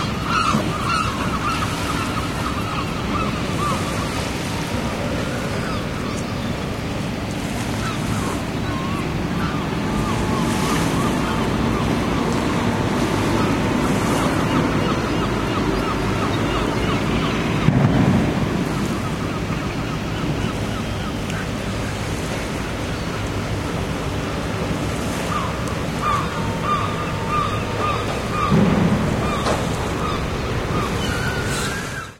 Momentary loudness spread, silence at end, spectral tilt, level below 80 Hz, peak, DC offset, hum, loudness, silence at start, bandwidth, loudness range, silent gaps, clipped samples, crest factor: 6 LU; 0 s; -5.5 dB/octave; -34 dBFS; 0 dBFS; under 0.1%; none; -22 LUFS; 0 s; 16.5 kHz; 5 LU; none; under 0.1%; 20 dB